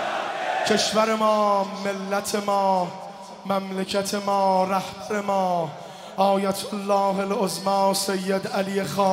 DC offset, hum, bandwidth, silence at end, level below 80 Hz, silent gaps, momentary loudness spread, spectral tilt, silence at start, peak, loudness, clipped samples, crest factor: under 0.1%; none; 16 kHz; 0 s; -66 dBFS; none; 8 LU; -4 dB/octave; 0 s; -6 dBFS; -23 LUFS; under 0.1%; 16 dB